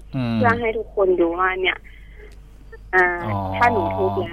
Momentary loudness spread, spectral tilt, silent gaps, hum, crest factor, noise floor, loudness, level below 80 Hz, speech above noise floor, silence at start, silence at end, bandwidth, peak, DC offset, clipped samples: 6 LU; -7.5 dB/octave; none; none; 16 dB; -41 dBFS; -20 LUFS; -42 dBFS; 21 dB; 0.1 s; 0 s; 9.8 kHz; -4 dBFS; under 0.1%; under 0.1%